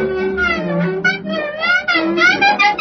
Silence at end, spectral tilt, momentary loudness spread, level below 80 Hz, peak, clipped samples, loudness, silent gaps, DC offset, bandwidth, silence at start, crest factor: 0 s; -5 dB/octave; 8 LU; -44 dBFS; -2 dBFS; under 0.1%; -15 LUFS; none; under 0.1%; 6.4 kHz; 0 s; 14 dB